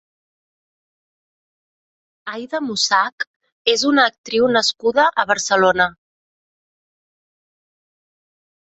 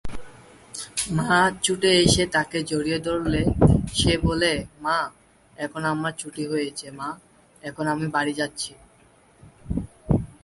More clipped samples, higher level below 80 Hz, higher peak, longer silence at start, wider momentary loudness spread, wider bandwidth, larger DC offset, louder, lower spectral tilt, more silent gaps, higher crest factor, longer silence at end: neither; second, -62 dBFS vs -38 dBFS; about the same, -2 dBFS vs -2 dBFS; first, 2.25 s vs 0.05 s; about the same, 14 LU vs 15 LU; second, 8.2 kHz vs 11.5 kHz; neither; first, -17 LUFS vs -23 LUFS; second, -2 dB/octave vs -4.5 dB/octave; first, 3.12-3.18 s, 3.27-3.40 s, 3.52-3.65 s, 4.18-4.24 s vs none; about the same, 20 dB vs 22 dB; first, 2.7 s vs 0.1 s